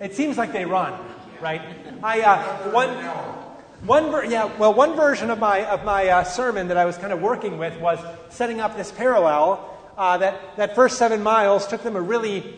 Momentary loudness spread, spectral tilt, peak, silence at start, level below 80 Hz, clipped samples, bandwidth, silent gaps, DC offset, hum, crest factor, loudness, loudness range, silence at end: 12 LU; -4.5 dB/octave; -4 dBFS; 0 s; -54 dBFS; under 0.1%; 9.6 kHz; none; under 0.1%; none; 18 dB; -21 LUFS; 3 LU; 0 s